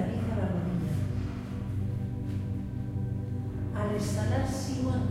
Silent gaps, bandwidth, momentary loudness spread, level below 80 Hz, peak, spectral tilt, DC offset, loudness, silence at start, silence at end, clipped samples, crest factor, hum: none; 14 kHz; 5 LU; -44 dBFS; -16 dBFS; -7 dB/octave; under 0.1%; -32 LUFS; 0 s; 0 s; under 0.1%; 14 dB; none